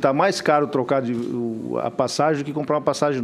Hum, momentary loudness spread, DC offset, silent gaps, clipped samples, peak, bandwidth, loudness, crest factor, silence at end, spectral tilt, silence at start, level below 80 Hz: none; 7 LU; under 0.1%; none; under 0.1%; -2 dBFS; 14.5 kHz; -22 LUFS; 18 dB; 0 s; -5.5 dB/octave; 0 s; -64 dBFS